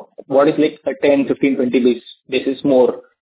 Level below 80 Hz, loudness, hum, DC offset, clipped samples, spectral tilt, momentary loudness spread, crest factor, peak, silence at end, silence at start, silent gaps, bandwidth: -58 dBFS; -16 LUFS; none; under 0.1%; under 0.1%; -10 dB/octave; 6 LU; 14 dB; -2 dBFS; 0.25 s; 0 s; none; 4 kHz